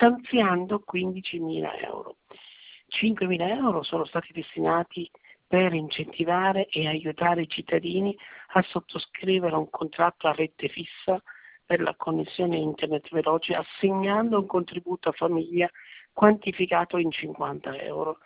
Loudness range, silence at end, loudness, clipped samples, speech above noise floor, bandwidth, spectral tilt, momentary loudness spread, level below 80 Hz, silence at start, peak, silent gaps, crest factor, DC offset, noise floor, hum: 3 LU; 0.1 s; -27 LUFS; under 0.1%; 24 dB; 4 kHz; -10 dB/octave; 9 LU; -64 dBFS; 0 s; -4 dBFS; none; 24 dB; under 0.1%; -50 dBFS; none